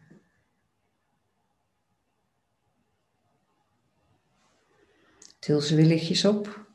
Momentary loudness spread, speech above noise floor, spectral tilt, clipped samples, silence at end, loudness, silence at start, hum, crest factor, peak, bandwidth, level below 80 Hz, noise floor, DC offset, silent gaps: 9 LU; 52 dB; -6 dB/octave; under 0.1%; 0.1 s; -23 LUFS; 5.45 s; none; 22 dB; -8 dBFS; 11 kHz; -72 dBFS; -76 dBFS; under 0.1%; none